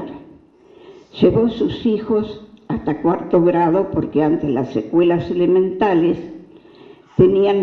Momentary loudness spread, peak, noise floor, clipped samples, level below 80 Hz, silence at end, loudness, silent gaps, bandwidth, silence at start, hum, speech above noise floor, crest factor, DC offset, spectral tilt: 12 LU; -2 dBFS; -47 dBFS; under 0.1%; -46 dBFS; 0 s; -17 LUFS; none; 6 kHz; 0 s; none; 31 dB; 16 dB; under 0.1%; -9.5 dB/octave